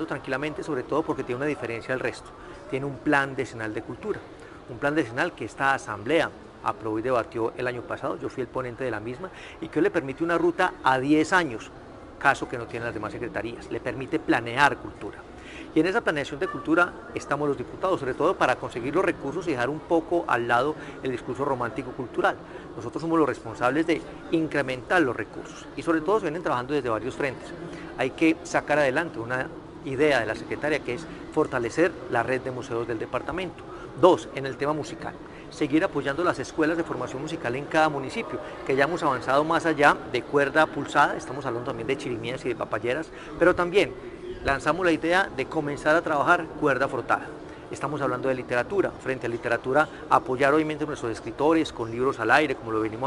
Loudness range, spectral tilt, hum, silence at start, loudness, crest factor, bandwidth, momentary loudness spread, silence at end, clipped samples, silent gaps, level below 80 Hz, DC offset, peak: 4 LU; -5.5 dB/octave; none; 0 s; -26 LUFS; 24 dB; 12 kHz; 12 LU; 0 s; under 0.1%; none; -54 dBFS; under 0.1%; -2 dBFS